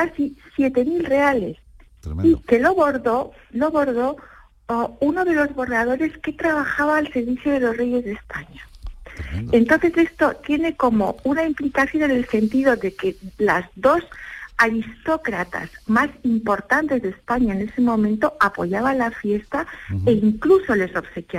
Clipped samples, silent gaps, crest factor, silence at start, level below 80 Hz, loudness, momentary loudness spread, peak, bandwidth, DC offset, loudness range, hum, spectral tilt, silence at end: under 0.1%; none; 16 dB; 0 s; -44 dBFS; -20 LUFS; 11 LU; -4 dBFS; 16 kHz; under 0.1%; 2 LU; none; -7 dB/octave; 0 s